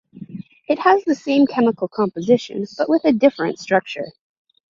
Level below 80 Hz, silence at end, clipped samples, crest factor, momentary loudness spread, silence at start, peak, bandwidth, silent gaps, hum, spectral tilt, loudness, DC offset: -64 dBFS; 0.6 s; under 0.1%; 18 dB; 18 LU; 0.15 s; -2 dBFS; 7.4 kHz; none; none; -6 dB/octave; -18 LUFS; under 0.1%